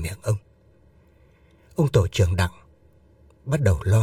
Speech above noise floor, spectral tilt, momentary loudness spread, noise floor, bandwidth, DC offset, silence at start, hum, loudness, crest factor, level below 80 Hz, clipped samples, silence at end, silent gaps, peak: 36 dB; -6.5 dB/octave; 9 LU; -56 dBFS; 14.5 kHz; under 0.1%; 0 s; none; -23 LUFS; 20 dB; -40 dBFS; under 0.1%; 0 s; none; -4 dBFS